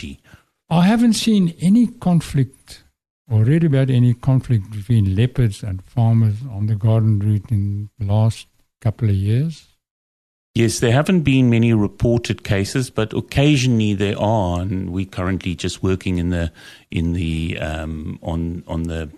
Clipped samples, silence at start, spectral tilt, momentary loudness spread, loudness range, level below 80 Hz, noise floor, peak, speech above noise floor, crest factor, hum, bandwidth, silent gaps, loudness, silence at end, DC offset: under 0.1%; 0 s; -7 dB/octave; 10 LU; 5 LU; -38 dBFS; under -90 dBFS; -2 dBFS; over 72 dB; 16 dB; none; 13 kHz; 3.10-3.25 s, 9.91-10.54 s; -19 LUFS; 0 s; under 0.1%